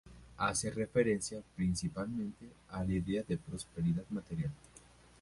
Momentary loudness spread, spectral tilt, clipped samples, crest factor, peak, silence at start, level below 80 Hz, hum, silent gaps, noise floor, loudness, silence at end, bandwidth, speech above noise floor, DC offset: 11 LU; -5.5 dB/octave; under 0.1%; 20 dB; -16 dBFS; 0.05 s; -54 dBFS; none; none; -60 dBFS; -37 LUFS; 0.4 s; 11.5 kHz; 24 dB; under 0.1%